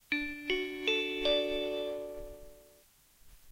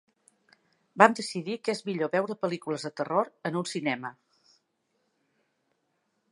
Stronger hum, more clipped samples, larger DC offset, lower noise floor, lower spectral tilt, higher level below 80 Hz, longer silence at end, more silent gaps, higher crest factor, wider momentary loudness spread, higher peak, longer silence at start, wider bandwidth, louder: neither; neither; neither; second, -64 dBFS vs -76 dBFS; second, -3 dB/octave vs -5 dB/octave; first, -56 dBFS vs -84 dBFS; second, 0 s vs 2.2 s; neither; second, 20 dB vs 30 dB; first, 16 LU vs 12 LU; second, -16 dBFS vs -2 dBFS; second, 0.1 s vs 0.95 s; first, 16 kHz vs 11.5 kHz; second, -33 LUFS vs -28 LUFS